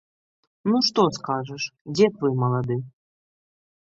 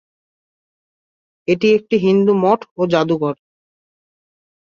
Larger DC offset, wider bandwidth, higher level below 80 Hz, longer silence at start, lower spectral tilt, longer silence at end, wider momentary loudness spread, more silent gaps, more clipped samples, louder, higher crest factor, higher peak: neither; about the same, 7.8 kHz vs 7.2 kHz; about the same, -64 dBFS vs -62 dBFS; second, 0.65 s vs 1.5 s; second, -6 dB/octave vs -7.5 dB/octave; second, 1.05 s vs 1.3 s; about the same, 10 LU vs 9 LU; about the same, 1.81-1.85 s vs 2.71-2.76 s; neither; second, -23 LUFS vs -16 LUFS; about the same, 20 dB vs 16 dB; second, -6 dBFS vs -2 dBFS